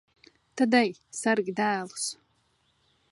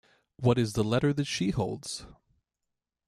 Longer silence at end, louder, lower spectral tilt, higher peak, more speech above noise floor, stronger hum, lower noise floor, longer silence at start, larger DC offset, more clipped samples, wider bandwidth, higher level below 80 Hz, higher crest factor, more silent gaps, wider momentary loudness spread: about the same, 1 s vs 0.95 s; about the same, -27 LUFS vs -29 LUFS; second, -3.5 dB/octave vs -6 dB/octave; first, -8 dBFS vs -12 dBFS; second, 43 dB vs 58 dB; neither; second, -70 dBFS vs -86 dBFS; first, 0.55 s vs 0.4 s; neither; neither; second, 11.5 kHz vs 13.5 kHz; second, -78 dBFS vs -54 dBFS; about the same, 20 dB vs 18 dB; neither; about the same, 12 LU vs 11 LU